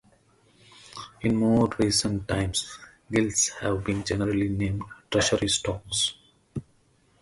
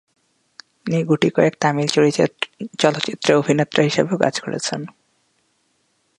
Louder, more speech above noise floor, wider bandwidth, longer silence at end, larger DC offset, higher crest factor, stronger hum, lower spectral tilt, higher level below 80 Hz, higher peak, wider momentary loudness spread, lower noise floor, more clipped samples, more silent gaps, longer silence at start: second, -26 LUFS vs -19 LUFS; second, 38 dB vs 47 dB; about the same, 11.5 kHz vs 11.5 kHz; second, 0.6 s vs 1.3 s; neither; about the same, 18 dB vs 20 dB; neither; about the same, -4 dB/octave vs -5 dB/octave; first, -46 dBFS vs -64 dBFS; second, -10 dBFS vs 0 dBFS; first, 17 LU vs 10 LU; about the same, -63 dBFS vs -66 dBFS; neither; neither; about the same, 0.85 s vs 0.85 s